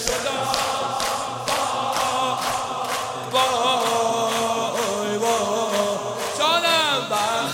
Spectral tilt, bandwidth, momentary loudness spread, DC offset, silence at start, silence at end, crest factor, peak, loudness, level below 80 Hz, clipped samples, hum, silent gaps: -2 dB/octave; 16.5 kHz; 6 LU; under 0.1%; 0 s; 0 s; 22 dB; -2 dBFS; -22 LUFS; -54 dBFS; under 0.1%; none; none